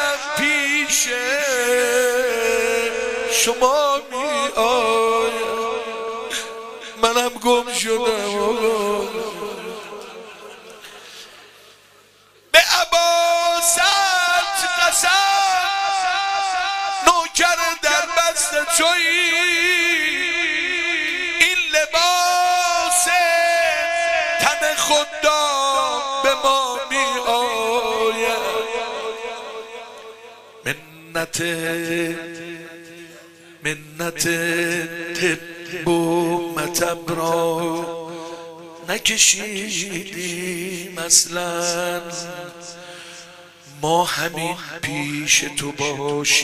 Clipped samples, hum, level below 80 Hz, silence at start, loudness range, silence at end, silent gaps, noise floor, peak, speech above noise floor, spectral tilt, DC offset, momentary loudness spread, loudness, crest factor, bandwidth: under 0.1%; none; -54 dBFS; 0 s; 9 LU; 0 s; none; -52 dBFS; 0 dBFS; 31 dB; -1.5 dB/octave; under 0.1%; 17 LU; -18 LUFS; 20 dB; 15.5 kHz